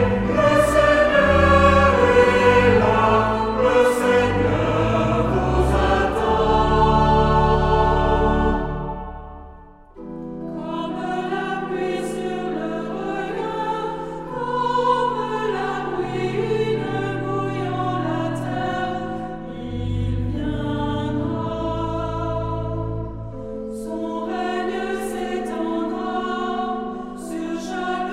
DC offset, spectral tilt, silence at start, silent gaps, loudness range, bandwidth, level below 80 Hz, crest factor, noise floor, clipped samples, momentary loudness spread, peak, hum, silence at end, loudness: under 0.1%; -6.5 dB/octave; 0 s; none; 11 LU; 15 kHz; -32 dBFS; 18 dB; -43 dBFS; under 0.1%; 14 LU; -2 dBFS; none; 0 s; -21 LUFS